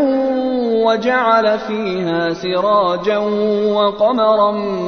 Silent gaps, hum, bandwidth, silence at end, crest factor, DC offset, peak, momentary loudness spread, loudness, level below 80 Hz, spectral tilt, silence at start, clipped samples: none; none; 6.6 kHz; 0 s; 14 dB; under 0.1%; 0 dBFS; 5 LU; -16 LUFS; -52 dBFS; -6.5 dB/octave; 0 s; under 0.1%